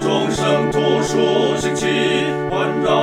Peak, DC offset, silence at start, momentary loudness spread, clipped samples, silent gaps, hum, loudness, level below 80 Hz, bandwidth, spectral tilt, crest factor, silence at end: -4 dBFS; 0.2%; 0 s; 3 LU; under 0.1%; none; none; -17 LUFS; -46 dBFS; 14 kHz; -5 dB/octave; 14 dB; 0 s